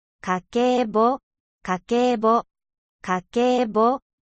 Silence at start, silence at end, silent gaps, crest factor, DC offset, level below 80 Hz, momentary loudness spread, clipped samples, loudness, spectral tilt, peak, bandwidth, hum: 0.25 s; 0.25 s; 1.23-1.31 s, 1.40-1.59 s, 2.78-2.99 s; 14 dB; under 0.1%; -60 dBFS; 9 LU; under 0.1%; -22 LUFS; -5.5 dB/octave; -8 dBFS; 8.4 kHz; none